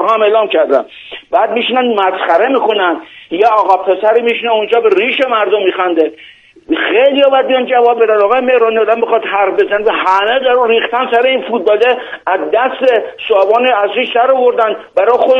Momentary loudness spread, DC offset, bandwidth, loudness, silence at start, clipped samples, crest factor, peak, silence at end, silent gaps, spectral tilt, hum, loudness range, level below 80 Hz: 5 LU; under 0.1%; 6.6 kHz; -11 LUFS; 0 s; under 0.1%; 12 dB; 0 dBFS; 0 s; none; -4.5 dB/octave; none; 2 LU; -58 dBFS